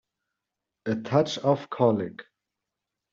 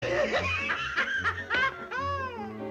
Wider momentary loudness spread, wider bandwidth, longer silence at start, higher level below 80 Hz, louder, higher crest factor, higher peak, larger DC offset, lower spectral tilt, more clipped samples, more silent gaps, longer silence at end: first, 13 LU vs 7 LU; second, 7.6 kHz vs 15 kHz; first, 0.85 s vs 0 s; second, -70 dBFS vs -54 dBFS; first, -26 LUFS vs -29 LUFS; first, 22 dB vs 14 dB; first, -8 dBFS vs -16 dBFS; neither; first, -6 dB/octave vs -4 dB/octave; neither; neither; first, 0.9 s vs 0 s